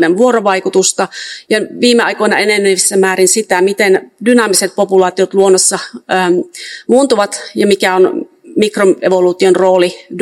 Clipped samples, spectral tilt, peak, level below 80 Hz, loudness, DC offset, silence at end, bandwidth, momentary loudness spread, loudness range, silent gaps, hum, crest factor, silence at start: 0.5%; -3 dB/octave; 0 dBFS; -62 dBFS; -11 LUFS; under 0.1%; 0 s; 13.5 kHz; 7 LU; 2 LU; none; none; 12 dB; 0 s